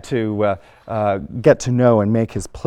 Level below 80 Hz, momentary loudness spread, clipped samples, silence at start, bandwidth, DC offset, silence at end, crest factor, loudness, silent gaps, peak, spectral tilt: -44 dBFS; 9 LU; under 0.1%; 0.05 s; 12 kHz; under 0.1%; 0.05 s; 16 dB; -18 LUFS; none; -2 dBFS; -7 dB/octave